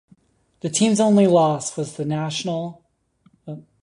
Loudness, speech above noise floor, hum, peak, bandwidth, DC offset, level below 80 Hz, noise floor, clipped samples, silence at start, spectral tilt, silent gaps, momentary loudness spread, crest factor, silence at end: -20 LUFS; 42 dB; none; -4 dBFS; 11 kHz; under 0.1%; -64 dBFS; -61 dBFS; under 0.1%; 0.65 s; -5.5 dB/octave; none; 20 LU; 16 dB; 0.2 s